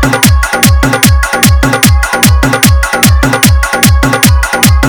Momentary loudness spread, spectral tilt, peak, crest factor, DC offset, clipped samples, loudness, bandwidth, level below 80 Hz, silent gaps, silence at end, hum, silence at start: 1 LU; -4 dB/octave; 0 dBFS; 6 dB; under 0.1%; 2%; -7 LUFS; over 20 kHz; -12 dBFS; none; 0 s; none; 0 s